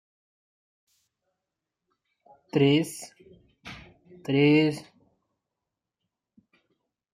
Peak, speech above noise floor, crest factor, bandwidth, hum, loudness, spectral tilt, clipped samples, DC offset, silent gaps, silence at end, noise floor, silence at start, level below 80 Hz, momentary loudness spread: -8 dBFS; 64 dB; 22 dB; 15.5 kHz; none; -24 LUFS; -6 dB/octave; under 0.1%; under 0.1%; none; 2.3 s; -86 dBFS; 2.55 s; -68 dBFS; 25 LU